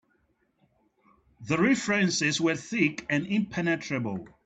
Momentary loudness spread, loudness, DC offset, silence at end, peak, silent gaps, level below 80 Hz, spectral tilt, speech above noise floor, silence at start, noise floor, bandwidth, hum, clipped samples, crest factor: 8 LU; -27 LUFS; under 0.1%; 0.2 s; -10 dBFS; none; -64 dBFS; -4.5 dB/octave; 44 dB; 1.4 s; -71 dBFS; 9 kHz; none; under 0.1%; 18 dB